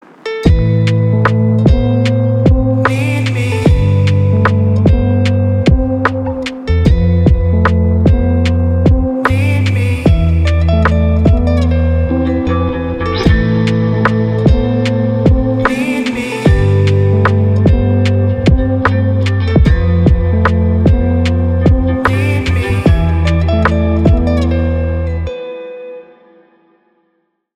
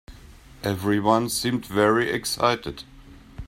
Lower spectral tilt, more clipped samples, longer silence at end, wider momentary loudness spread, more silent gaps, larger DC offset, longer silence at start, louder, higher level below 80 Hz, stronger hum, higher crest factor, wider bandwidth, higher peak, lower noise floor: first, -8 dB/octave vs -4.5 dB/octave; neither; first, 1.55 s vs 0 s; second, 4 LU vs 10 LU; neither; neither; first, 0.25 s vs 0.1 s; first, -12 LUFS vs -23 LUFS; first, -18 dBFS vs -48 dBFS; neither; second, 10 dB vs 20 dB; second, 9.6 kHz vs 16.5 kHz; first, 0 dBFS vs -4 dBFS; first, -63 dBFS vs -47 dBFS